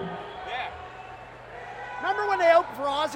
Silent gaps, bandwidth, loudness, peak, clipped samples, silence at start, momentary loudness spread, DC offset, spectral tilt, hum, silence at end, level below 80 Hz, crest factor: none; 14 kHz; -26 LUFS; -8 dBFS; under 0.1%; 0 s; 22 LU; under 0.1%; -4 dB/octave; none; 0 s; -58 dBFS; 18 dB